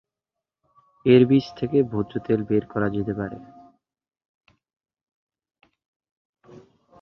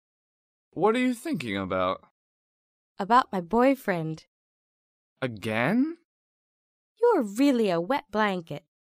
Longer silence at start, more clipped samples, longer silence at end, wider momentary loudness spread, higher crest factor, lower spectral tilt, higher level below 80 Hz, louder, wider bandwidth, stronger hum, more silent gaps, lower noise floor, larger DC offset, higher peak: first, 1.05 s vs 0.75 s; neither; first, 3.6 s vs 0.35 s; about the same, 13 LU vs 14 LU; about the same, 22 dB vs 20 dB; first, -9 dB/octave vs -6 dB/octave; first, -56 dBFS vs -64 dBFS; first, -22 LUFS vs -26 LUFS; second, 6.2 kHz vs 15.5 kHz; neither; second, none vs 2.11-2.95 s, 4.28-5.16 s, 6.05-6.95 s; about the same, -87 dBFS vs under -90 dBFS; neither; first, -4 dBFS vs -8 dBFS